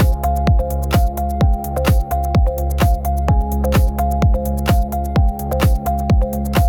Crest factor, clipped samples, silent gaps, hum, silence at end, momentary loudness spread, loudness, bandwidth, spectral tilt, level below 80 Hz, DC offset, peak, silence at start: 10 dB; under 0.1%; none; none; 0 s; 2 LU; -18 LUFS; 18 kHz; -7 dB/octave; -18 dBFS; under 0.1%; -4 dBFS; 0 s